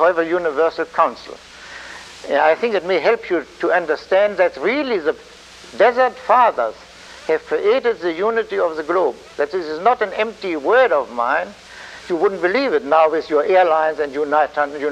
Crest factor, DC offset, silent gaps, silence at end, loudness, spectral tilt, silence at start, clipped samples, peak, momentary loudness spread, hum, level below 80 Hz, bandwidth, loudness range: 16 dB; under 0.1%; none; 0 s; -18 LUFS; -4.5 dB/octave; 0 s; under 0.1%; -2 dBFS; 18 LU; none; -56 dBFS; 10 kHz; 2 LU